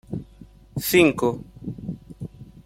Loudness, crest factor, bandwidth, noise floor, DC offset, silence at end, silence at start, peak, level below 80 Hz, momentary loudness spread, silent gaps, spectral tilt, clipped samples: -21 LUFS; 22 dB; 16.5 kHz; -48 dBFS; under 0.1%; 0.2 s; 0.1 s; -4 dBFS; -50 dBFS; 21 LU; none; -5 dB/octave; under 0.1%